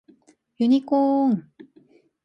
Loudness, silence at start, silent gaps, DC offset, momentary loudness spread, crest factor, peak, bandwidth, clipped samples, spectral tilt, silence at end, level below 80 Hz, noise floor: -21 LUFS; 0.6 s; none; under 0.1%; 6 LU; 14 dB; -10 dBFS; 6 kHz; under 0.1%; -8.5 dB/octave; 0.85 s; -74 dBFS; -58 dBFS